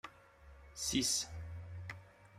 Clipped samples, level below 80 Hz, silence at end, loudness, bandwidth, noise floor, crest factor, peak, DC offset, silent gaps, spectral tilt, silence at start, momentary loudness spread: under 0.1%; -60 dBFS; 0 s; -38 LUFS; 15.5 kHz; -60 dBFS; 20 dB; -22 dBFS; under 0.1%; none; -2 dB/octave; 0.05 s; 21 LU